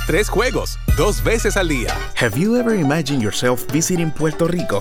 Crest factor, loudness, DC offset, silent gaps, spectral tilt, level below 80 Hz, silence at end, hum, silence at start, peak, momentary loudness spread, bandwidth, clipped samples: 14 dB; -18 LUFS; under 0.1%; none; -4.5 dB/octave; -26 dBFS; 0 s; none; 0 s; -4 dBFS; 4 LU; over 20 kHz; under 0.1%